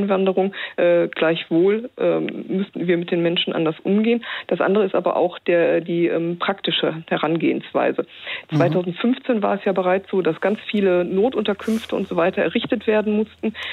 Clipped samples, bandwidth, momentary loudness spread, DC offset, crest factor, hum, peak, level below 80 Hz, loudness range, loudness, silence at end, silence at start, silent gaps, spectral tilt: under 0.1%; 11.5 kHz; 5 LU; under 0.1%; 14 dB; none; -6 dBFS; -64 dBFS; 1 LU; -20 LUFS; 0 s; 0 s; none; -7.5 dB/octave